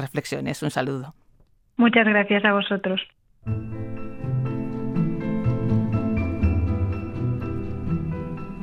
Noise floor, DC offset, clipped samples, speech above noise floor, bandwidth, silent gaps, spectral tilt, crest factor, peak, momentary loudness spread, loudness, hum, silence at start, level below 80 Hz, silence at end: -58 dBFS; under 0.1%; under 0.1%; 36 dB; 16.5 kHz; none; -7 dB/octave; 20 dB; -4 dBFS; 15 LU; -24 LUFS; none; 0 s; -38 dBFS; 0 s